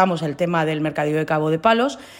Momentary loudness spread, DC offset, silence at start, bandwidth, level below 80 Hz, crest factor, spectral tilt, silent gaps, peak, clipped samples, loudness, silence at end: 5 LU; under 0.1%; 0 s; 16.5 kHz; -58 dBFS; 16 dB; -6.5 dB/octave; none; -4 dBFS; under 0.1%; -20 LUFS; 0 s